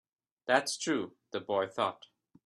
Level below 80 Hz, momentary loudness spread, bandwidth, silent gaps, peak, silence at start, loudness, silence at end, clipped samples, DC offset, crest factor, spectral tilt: -82 dBFS; 13 LU; 13 kHz; none; -10 dBFS; 0.45 s; -33 LUFS; 0.5 s; under 0.1%; under 0.1%; 24 dB; -3 dB/octave